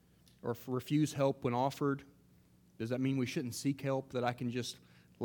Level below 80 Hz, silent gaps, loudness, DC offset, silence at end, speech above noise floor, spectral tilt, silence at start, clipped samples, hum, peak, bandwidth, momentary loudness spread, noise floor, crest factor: -72 dBFS; none; -36 LUFS; under 0.1%; 0 s; 30 dB; -6 dB/octave; 0.45 s; under 0.1%; none; -18 dBFS; 19 kHz; 10 LU; -65 dBFS; 18 dB